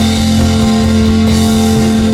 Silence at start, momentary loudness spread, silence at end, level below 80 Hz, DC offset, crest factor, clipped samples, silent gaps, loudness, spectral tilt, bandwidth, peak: 0 s; 1 LU; 0 s; -22 dBFS; under 0.1%; 8 dB; under 0.1%; none; -10 LUFS; -5.5 dB/octave; 15.5 kHz; 0 dBFS